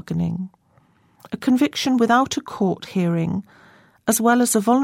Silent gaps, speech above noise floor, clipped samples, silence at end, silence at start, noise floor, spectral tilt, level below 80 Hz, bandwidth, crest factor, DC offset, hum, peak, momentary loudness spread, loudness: none; 39 dB; under 0.1%; 0 s; 0.1 s; -58 dBFS; -5 dB/octave; -58 dBFS; 16.5 kHz; 16 dB; under 0.1%; none; -4 dBFS; 12 LU; -20 LUFS